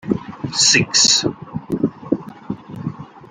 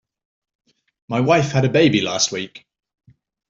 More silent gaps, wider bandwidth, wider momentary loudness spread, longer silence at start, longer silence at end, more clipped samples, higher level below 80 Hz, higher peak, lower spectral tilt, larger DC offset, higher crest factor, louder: neither; first, 15.5 kHz vs 7.6 kHz; first, 19 LU vs 12 LU; second, 0.05 s vs 1.1 s; second, 0.05 s vs 0.9 s; neither; about the same, -54 dBFS vs -58 dBFS; about the same, 0 dBFS vs -2 dBFS; second, -2 dB/octave vs -4.5 dB/octave; neither; about the same, 20 dB vs 18 dB; about the same, -16 LUFS vs -18 LUFS